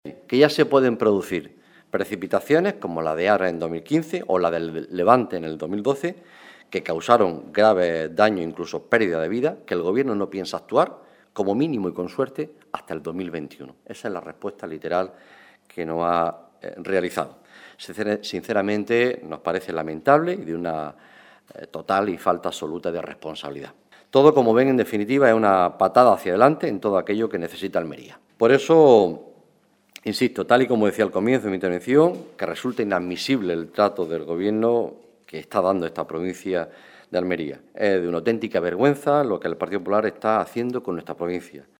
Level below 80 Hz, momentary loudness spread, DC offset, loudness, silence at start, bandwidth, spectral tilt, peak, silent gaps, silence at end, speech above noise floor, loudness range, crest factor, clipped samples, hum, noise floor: -64 dBFS; 15 LU; under 0.1%; -22 LUFS; 0.05 s; 17 kHz; -6 dB/octave; 0 dBFS; none; 0.2 s; 39 dB; 8 LU; 22 dB; under 0.1%; none; -61 dBFS